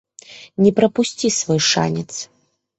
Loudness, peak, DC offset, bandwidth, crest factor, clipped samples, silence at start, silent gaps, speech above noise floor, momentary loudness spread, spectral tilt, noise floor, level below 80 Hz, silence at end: -17 LUFS; -2 dBFS; under 0.1%; 8.4 kHz; 18 dB; under 0.1%; 0.3 s; none; 25 dB; 17 LU; -4 dB/octave; -42 dBFS; -56 dBFS; 0.55 s